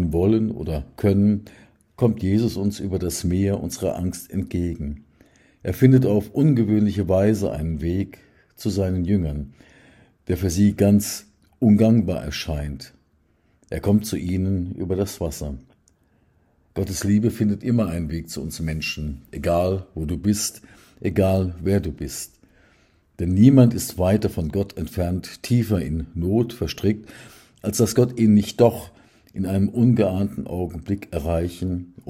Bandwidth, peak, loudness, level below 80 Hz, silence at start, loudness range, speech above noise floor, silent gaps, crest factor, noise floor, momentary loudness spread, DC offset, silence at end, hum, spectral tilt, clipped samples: 16 kHz; -2 dBFS; -22 LUFS; -42 dBFS; 0 s; 6 LU; 42 dB; none; 20 dB; -62 dBFS; 13 LU; under 0.1%; 0.25 s; none; -7 dB/octave; under 0.1%